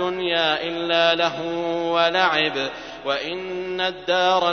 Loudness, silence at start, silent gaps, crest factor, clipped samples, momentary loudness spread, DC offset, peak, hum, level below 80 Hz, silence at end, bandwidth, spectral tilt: -21 LUFS; 0 s; none; 18 dB; under 0.1%; 10 LU; under 0.1%; -4 dBFS; none; -58 dBFS; 0 s; 6.6 kHz; -4 dB/octave